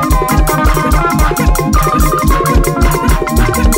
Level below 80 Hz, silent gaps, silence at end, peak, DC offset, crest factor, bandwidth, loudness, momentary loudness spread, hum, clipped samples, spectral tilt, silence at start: -14 dBFS; none; 0 s; 0 dBFS; under 0.1%; 10 dB; 16.5 kHz; -12 LUFS; 1 LU; none; under 0.1%; -5.5 dB/octave; 0 s